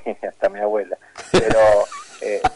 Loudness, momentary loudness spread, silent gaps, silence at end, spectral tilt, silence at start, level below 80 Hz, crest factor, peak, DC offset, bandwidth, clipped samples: -19 LUFS; 15 LU; none; 0 s; -4.5 dB/octave; 0 s; -40 dBFS; 12 dB; -6 dBFS; under 0.1%; 11.5 kHz; under 0.1%